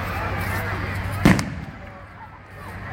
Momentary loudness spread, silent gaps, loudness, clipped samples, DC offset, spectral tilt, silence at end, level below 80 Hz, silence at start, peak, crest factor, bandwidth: 22 LU; none; -23 LUFS; under 0.1%; under 0.1%; -6 dB/octave; 0 s; -36 dBFS; 0 s; 0 dBFS; 24 dB; 16 kHz